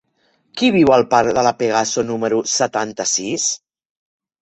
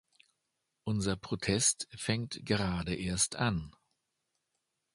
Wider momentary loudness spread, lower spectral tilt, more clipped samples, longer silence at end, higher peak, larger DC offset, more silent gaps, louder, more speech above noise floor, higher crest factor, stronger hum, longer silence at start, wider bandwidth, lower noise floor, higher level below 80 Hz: about the same, 8 LU vs 9 LU; about the same, -3 dB/octave vs -3.5 dB/octave; neither; second, 0.85 s vs 1.25 s; first, -2 dBFS vs -14 dBFS; neither; neither; first, -17 LUFS vs -32 LUFS; second, 46 dB vs 51 dB; second, 16 dB vs 22 dB; neither; second, 0.55 s vs 0.85 s; second, 8.4 kHz vs 11.5 kHz; second, -63 dBFS vs -84 dBFS; about the same, -54 dBFS vs -54 dBFS